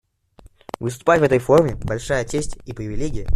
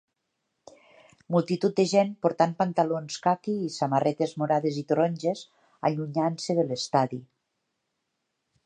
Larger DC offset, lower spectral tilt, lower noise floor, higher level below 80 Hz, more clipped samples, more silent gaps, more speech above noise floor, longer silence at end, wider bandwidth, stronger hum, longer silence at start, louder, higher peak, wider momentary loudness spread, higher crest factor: neither; about the same, -6 dB/octave vs -6 dB/octave; second, -50 dBFS vs -80 dBFS; first, -36 dBFS vs -74 dBFS; neither; neither; second, 31 dB vs 54 dB; second, 0 s vs 1.4 s; first, 14 kHz vs 9.8 kHz; neither; second, 0.8 s vs 1.3 s; first, -20 LUFS vs -26 LUFS; first, -2 dBFS vs -8 dBFS; first, 15 LU vs 7 LU; about the same, 18 dB vs 20 dB